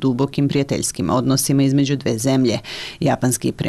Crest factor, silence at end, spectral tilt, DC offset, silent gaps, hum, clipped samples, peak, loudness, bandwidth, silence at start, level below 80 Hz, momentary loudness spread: 10 dB; 0 s; -5 dB/octave; under 0.1%; none; none; under 0.1%; -8 dBFS; -19 LUFS; 14 kHz; 0 s; -48 dBFS; 5 LU